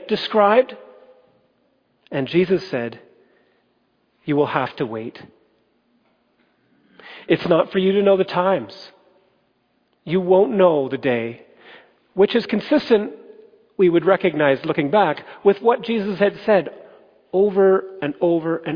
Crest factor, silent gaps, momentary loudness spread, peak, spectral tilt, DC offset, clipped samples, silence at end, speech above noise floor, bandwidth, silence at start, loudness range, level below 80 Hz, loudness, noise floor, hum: 18 dB; none; 14 LU; -2 dBFS; -8 dB/octave; under 0.1%; under 0.1%; 0 s; 47 dB; 5.2 kHz; 0 s; 8 LU; -64 dBFS; -19 LUFS; -65 dBFS; none